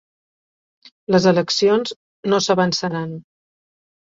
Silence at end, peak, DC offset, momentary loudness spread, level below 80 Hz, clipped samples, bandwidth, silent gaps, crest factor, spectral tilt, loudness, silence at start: 0.95 s; -2 dBFS; under 0.1%; 15 LU; -62 dBFS; under 0.1%; 7.8 kHz; 1.96-2.23 s; 18 dB; -5 dB/octave; -18 LUFS; 1.1 s